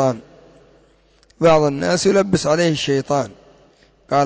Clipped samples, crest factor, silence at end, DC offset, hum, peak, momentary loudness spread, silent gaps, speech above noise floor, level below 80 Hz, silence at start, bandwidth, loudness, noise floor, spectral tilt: under 0.1%; 14 dB; 0 s; under 0.1%; none; -4 dBFS; 8 LU; none; 38 dB; -50 dBFS; 0 s; 8 kHz; -17 LUFS; -55 dBFS; -5 dB/octave